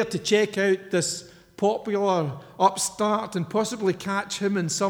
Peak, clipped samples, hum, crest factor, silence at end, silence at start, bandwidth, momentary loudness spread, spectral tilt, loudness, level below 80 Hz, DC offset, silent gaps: -6 dBFS; under 0.1%; none; 20 dB; 0 s; 0 s; 20 kHz; 5 LU; -4 dB/octave; -25 LUFS; -66 dBFS; under 0.1%; none